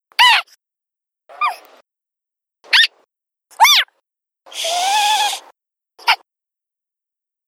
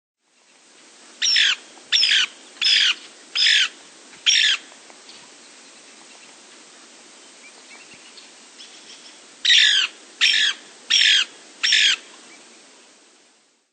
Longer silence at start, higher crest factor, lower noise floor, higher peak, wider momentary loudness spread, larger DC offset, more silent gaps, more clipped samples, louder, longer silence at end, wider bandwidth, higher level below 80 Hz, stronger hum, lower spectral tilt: second, 0.2 s vs 1.2 s; about the same, 20 dB vs 20 dB; first, -82 dBFS vs -59 dBFS; about the same, 0 dBFS vs -2 dBFS; about the same, 14 LU vs 12 LU; neither; neither; neither; first, -14 LUFS vs -17 LUFS; second, 1.35 s vs 1.7 s; first, 17.5 kHz vs 9.4 kHz; first, -78 dBFS vs -90 dBFS; neither; about the same, 5 dB/octave vs 4.5 dB/octave